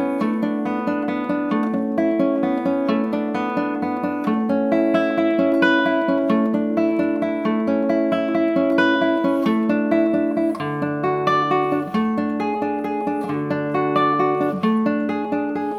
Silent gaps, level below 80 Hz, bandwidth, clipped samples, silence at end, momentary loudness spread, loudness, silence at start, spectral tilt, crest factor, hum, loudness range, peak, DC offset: none; -66 dBFS; 11.5 kHz; under 0.1%; 0 s; 5 LU; -20 LUFS; 0 s; -7.5 dB/octave; 16 dB; none; 2 LU; -4 dBFS; under 0.1%